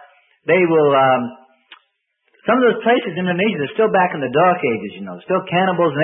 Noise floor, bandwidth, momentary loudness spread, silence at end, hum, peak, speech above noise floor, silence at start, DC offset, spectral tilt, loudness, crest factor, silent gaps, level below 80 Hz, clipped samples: -67 dBFS; 3.8 kHz; 12 LU; 0 s; none; -2 dBFS; 51 dB; 0.45 s; under 0.1%; -11.5 dB/octave; -17 LUFS; 14 dB; none; -66 dBFS; under 0.1%